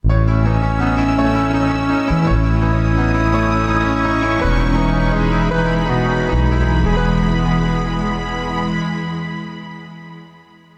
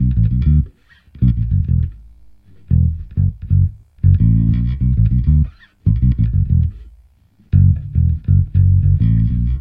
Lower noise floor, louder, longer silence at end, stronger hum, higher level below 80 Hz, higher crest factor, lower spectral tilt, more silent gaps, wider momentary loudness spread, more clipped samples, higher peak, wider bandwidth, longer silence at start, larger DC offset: second, -45 dBFS vs -51 dBFS; about the same, -17 LUFS vs -16 LUFS; first, 0.5 s vs 0 s; neither; about the same, -22 dBFS vs -20 dBFS; about the same, 12 dB vs 14 dB; second, -7.5 dB/octave vs -12.5 dB/octave; neither; about the same, 8 LU vs 6 LU; neither; second, -4 dBFS vs 0 dBFS; first, 8.4 kHz vs 3.5 kHz; about the same, 0.05 s vs 0 s; neither